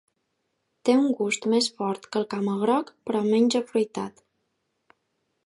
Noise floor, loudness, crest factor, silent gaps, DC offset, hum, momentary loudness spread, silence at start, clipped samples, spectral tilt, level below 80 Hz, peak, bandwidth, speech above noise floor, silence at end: -76 dBFS; -25 LUFS; 18 dB; none; under 0.1%; none; 8 LU; 0.85 s; under 0.1%; -4.5 dB/octave; -76 dBFS; -8 dBFS; 11.5 kHz; 52 dB; 1.35 s